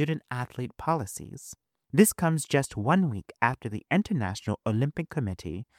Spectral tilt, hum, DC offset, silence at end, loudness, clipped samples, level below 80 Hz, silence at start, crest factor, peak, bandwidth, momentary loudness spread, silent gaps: -5.5 dB/octave; none; under 0.1%; 0.15 s; -28 LUFS; under 0.1%; -56 dBFS; 0 s; 22 dB; -6 dBFS; 16.5 kHz; 14 LU; none